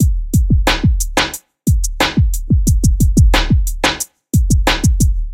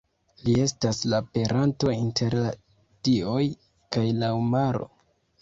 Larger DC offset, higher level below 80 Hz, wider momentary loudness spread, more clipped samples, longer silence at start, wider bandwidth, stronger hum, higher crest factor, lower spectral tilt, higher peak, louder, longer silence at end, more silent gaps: neither; first, -16 dBFS vs -54 dBFS; second, 5 LU vs 8 LU; neither; second, 0 s vs 0.45 s; first, 16.5 kHz vs 7.8 kHz; neither; about the same, 12 dB vs 16 dB; second, -4.5 dB/octave vs -6 dB/octave; first, 0 dBFS vs -8 dBFS; first, -15 LUFS vs -26 LUFS; second, 0 s vs 0.55 s; neither